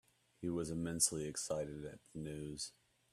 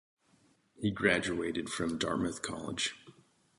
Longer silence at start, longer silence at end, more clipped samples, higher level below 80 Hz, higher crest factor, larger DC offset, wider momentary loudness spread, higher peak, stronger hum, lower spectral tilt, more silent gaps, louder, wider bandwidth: second, 0.4 s vs 0.8 s; about the same, 0.45 s vs 0.5 s; neither; second, -66 dBFS vs -60 dBFS; about the same, 24 dB vs 22 dB; neither; first, 14 LU vs 9 LU; second, -18 dBFS vs -12 dBFS; neither; about the same, -3.5 dB/octave vs -4 dB/octave; neither; second, -40 LUFS vs -33 LUFS; first, 14.5 kHz vs 11.5 kHz